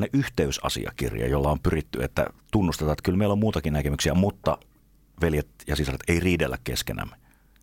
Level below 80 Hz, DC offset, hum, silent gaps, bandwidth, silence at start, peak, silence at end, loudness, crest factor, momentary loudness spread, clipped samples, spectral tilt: -36 dBFS; under 0.1%; none; none; 17 kHz; 0 s; -8 dBFS; 0.5 s; -26 LUFS; 18 dB; 6 LU; under 0.1%; -5.5 dB/octave